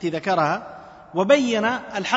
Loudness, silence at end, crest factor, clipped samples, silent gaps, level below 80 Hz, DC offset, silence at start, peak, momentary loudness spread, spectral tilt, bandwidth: -21 LUFS; 0 s; 18 dB; under 0.1%; none; -62 dBFS; under 0.1%; 0 s; -4 dBFS; 12 LU; -4.5 dB/octave; 8 kHz